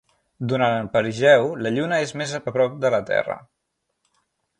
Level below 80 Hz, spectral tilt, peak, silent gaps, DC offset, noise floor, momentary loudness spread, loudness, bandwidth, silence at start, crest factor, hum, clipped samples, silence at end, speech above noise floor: -60 dBFS; -5.5 dB/octave; -2 dBFS; none; under 0.1%; -77 dBFS; 11 LU; -21 LUFS; 10.5 kHz; 0.4 s; 20 dB; none; under 0.1%; 1.2 s; 56 dB